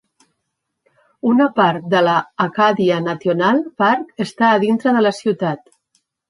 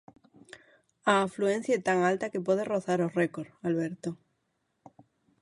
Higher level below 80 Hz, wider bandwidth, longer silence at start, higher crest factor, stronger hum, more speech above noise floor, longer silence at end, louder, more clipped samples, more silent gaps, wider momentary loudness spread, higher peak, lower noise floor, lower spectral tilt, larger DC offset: first, -66 dBFS vs -74 dBFS; about the same, 11.5 kHz vs 11.5 kHz; first, 1.25 s vs 0.55 s; second, 16 dB vs 22 dB; neither; first, 59 dB vs 49 dB; second, 0.7 s vs 1.3 s; first, -17 LUFS vs -29 LUFS; neither; neither; second, 7 LU vs 10 LU; first, -2 dBFS vs -10 dBFS; about the same, -75 dBFS vs -78 dBFS; about the same, -6.5 dB/octave vs -6 dB/octave; neither